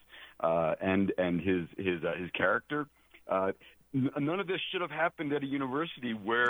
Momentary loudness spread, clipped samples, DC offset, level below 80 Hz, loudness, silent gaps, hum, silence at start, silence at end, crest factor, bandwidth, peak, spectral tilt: 7 LU; under 0.1%; under 0.1%; -66 dBFS; -32 LUFS; none; none; 0.1 s; 0 s; 18 dB; over 20 kHz; -14 dBFS; -7.5 dB/octave